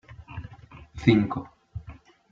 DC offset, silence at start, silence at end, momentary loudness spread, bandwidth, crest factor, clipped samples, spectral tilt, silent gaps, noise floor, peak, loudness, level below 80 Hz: under 0.1%; 0.1 s; 0.4 s; 24 LU; 7.6 kHz; 24 dB; under 0.1%; -8 dB/octave; none; -48 dBFS; -4 dBFS; -24 LUFS; -50 dBFS